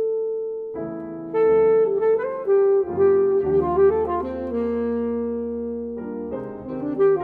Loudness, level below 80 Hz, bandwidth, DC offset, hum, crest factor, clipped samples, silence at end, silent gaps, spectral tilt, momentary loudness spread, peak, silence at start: -22 LUFS; -50 dBFS; 3.3 kHz; under 0.1%; none; 12 dB; under 0.1%; 0 s; none; -10.5 dB/octave; 13 LU; -8 dBFS; 0 s